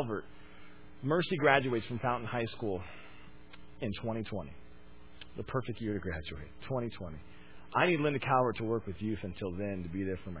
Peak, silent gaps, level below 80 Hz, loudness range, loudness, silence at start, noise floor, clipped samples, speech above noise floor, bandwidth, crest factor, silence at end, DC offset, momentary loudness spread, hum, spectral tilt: -10 dBFS; none; -54 dBFS; 7 LU; -34 LUFS; 0 s; -56 dBFS; under 0.1%; 22 dB; 4 kHz; 24 dB; 0 s; 0.4%; 21 LU; none; -5 dB/octave